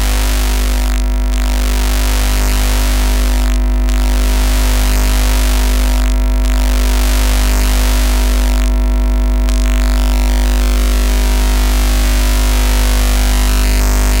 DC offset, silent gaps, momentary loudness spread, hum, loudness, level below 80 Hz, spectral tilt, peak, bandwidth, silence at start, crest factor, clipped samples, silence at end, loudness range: under 0.1%; none; 2 LU; 50 Hz at -10 dBFS; -14 LUFS; -12 dBFS; -4.5 dB/octave; 0 dBFS; 17 kHz; 0 s; 10 dB; under 0.1%; 0 s; 1 LU